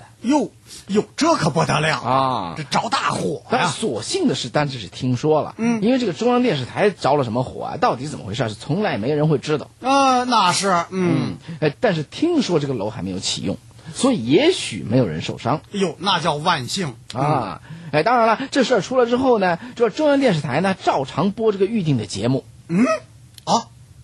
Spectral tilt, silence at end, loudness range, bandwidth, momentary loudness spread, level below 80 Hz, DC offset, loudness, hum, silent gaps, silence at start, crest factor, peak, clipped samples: -5 dB/octave; 0 s; 3 LU; 12 kHz; 9 LU; -54 dBFS; under 0.1%; -20 LUFS; none; none; 0 s; 16 dB; -4 dBFS; under 0.1%